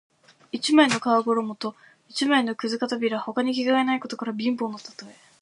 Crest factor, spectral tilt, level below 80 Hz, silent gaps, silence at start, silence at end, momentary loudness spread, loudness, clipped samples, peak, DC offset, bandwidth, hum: 20 dB; -3.5 dB/octave; -76 dBFS; none; 0.55 s; 0.3 s; 15 LU; -24 LUFS; under 0.1%; -4 dBFS; under 0.1%; 11.5 kHz; none